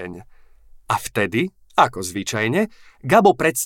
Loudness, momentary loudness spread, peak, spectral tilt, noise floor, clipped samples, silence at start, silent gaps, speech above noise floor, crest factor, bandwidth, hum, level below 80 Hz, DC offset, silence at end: -20 LUFS; 12 LU; -2 dBFS; -4.5 dB/octave; -46 dBFS; under 0.1%; 0 s; none; 27 dB; 18 dB; 17 kHz; none; -52 dBFS; under 0.1%; 0 s